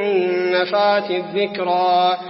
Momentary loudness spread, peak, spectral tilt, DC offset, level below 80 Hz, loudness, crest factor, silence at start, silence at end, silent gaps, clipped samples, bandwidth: 5 LU; -4 dBFS; -8.5 dB/octave; under 0.1%; -74 dBFS; -18 LUFS; 14 dB; 0 s; 0 s; none; under 0.1%; 5.8 kHz